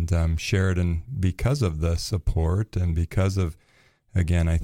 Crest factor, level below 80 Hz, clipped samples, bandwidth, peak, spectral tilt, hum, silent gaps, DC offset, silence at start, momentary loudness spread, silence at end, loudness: 14 dB; -32 dBFS; under 0.1%; 13 kHz; -8 dBFS; -6.5 dB/octave; none; none; under 0.1%; 0 s; 5 LU; 0 s; -25 LUFS